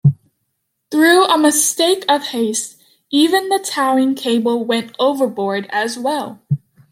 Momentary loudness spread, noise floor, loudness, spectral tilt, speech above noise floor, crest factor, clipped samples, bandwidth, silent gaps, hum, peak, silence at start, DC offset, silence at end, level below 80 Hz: 11 LU; -71 dBFS; -16 LUFS; -4 dB/octave; 56 dB; 16 dB; under 0.1%; 16.5 kHz; none; none; 0 dBFS; 0.05 s; under 0.1%; 0.35 s; -66 dBFS